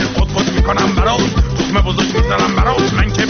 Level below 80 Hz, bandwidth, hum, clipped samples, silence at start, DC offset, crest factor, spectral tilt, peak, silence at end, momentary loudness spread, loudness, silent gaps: -18 dBFS; 6.8 kHz; none; under 0.1%; 0 s; under 0.1%; 12 dB; -4.5 dB/octave; -2 dBFS; 0 s; 2 LU; -14 LUFS; none